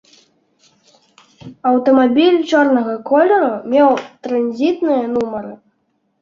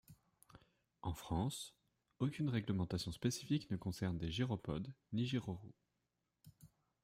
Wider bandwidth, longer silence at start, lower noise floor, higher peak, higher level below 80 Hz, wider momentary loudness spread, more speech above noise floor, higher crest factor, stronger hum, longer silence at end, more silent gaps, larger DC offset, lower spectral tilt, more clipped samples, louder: second, 7.4 kHz vs 16 kHz; first, 1.45 s vs 0.1 s; second, -65 dBFS vs -87 dBFS; first, -2 dBFS vs -24 dBFS; about the same, -62 dBFS vs -62 dBFS; about the same, 9 LU vs 10 LU; first, 51 dB vs 47 dB; second, 14 dB vs 20 dB; neither; first, 0.65 s vs 0.35 s; neither; neither; about the same, -5.5 dB/octave vs -6 dB/octave; neither; first, -15 LUFS vs -42 LUFS